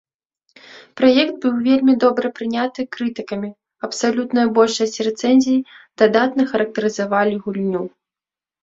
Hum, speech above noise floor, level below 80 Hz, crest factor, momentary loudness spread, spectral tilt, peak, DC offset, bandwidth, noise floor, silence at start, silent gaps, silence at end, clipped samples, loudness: none; over 73 dB; -62 dBFS; 18 dB; 12 LU; -4.5 dB/octave; -2 dBFS; under 0.1%; 7.8 kHz; under -90 dBFS; 0.7 s; none; 0.75 s; under 0.1%; -18 LUFS